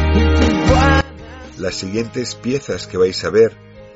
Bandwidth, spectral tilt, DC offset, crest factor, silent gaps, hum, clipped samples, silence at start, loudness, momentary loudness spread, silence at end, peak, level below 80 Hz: 8 kHz; -5 dB/octave; under 0.1%; 14 dB; none; none; under 0.1%; 0 s; -17 LUFS; 12 LU; 0.1 s; -2 dBFS; -26 dBFS